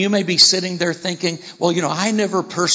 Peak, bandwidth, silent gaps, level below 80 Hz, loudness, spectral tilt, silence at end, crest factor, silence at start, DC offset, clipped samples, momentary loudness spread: 0 dBFS; 8 kHz; none; -66 dBFS; -17 LUFS; -3 dB/octave; 0 s; 18 dB; 0 s; under 0.1%; under 0.1%; 10 LU